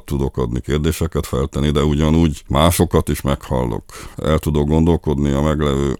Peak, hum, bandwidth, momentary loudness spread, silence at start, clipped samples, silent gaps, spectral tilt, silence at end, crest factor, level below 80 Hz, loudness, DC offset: 0 dBFS; none; 17.5 kHz; 7 LU; 0.05 s; under 0.1%; none; -6.5 dB/octave; 0.05 s; 16 dB; -26 dBFS; -18 LUFS; under 0.1%